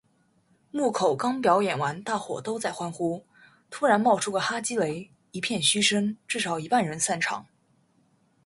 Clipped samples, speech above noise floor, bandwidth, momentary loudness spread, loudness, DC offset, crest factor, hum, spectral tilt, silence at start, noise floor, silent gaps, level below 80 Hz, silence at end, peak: under 0.1%; 40 dB; 11.5 kHz; 10 LU; -26 LUFS; under 0.1%; 22 dB; none; -3 dB/octave; 0.75 s; -66 dBFS; none; -70 dBFS; 1.05 s; -6 dBFS